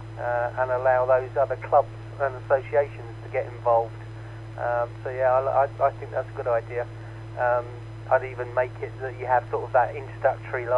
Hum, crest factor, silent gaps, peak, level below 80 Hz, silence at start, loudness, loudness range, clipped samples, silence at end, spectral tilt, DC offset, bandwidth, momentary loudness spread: none; 18 dB; none; -8 dBFS; -50 dBFS; 0 s; -25 LUFS; 3 LU; under 0.1%; 0 s; -8 dB/octave; under 0.1%; 9.6 kHz; 13 LU